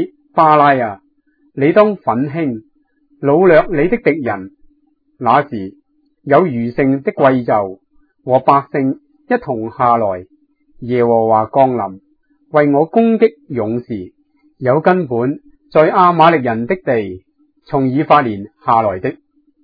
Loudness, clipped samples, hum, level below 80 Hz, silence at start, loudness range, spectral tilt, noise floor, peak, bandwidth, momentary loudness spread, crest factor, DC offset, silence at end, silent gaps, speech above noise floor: -14 LUFS; under 0.1%; none; -48 dBFS; 0 s; 3 LU; -10 dB/octave; -58 dBFS; 0 dBFS; 5.4 kHz; 15 LU; 14 dB; under 0.1%; 0.5 s; none; 45 dB